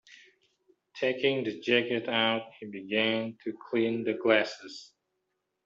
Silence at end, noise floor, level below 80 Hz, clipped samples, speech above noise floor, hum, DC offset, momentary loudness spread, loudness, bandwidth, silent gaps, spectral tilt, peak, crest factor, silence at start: 0.8 s; -81 dBFS; -76 dBFS; under 0.1%; 52 dB; none; under 0.1%; 17 LU; -29 LUFS; 7.6 kHz; none; -5 dB/octave; -10 dBFS; 22 dB; 0.1 s